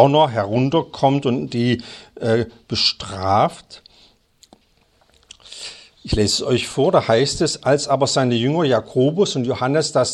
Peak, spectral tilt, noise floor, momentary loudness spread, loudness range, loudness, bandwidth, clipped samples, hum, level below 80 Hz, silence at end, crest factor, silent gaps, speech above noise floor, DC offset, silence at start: 0 dBFS; -5 dB/octave; -59 dBFS; 9 LU; 7 LU; -18 LUFS; 12.5 kHz; under 0.1%; none; -44 dBFS; 0 s; 20 dB; none; 41 dB; under 0.1%; 0 s